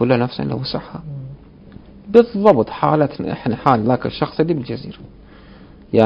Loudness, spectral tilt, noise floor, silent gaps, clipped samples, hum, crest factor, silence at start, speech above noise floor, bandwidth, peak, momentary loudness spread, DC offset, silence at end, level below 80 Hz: -18 LUFS; -9 dB/octave; -42 dBFS; none; 0.1%; none; 18 dB; 0 s; 25 dB; 6 kHz; 0 dBFS; 17 LU; under 0.1%; 0 s; -46 dBFS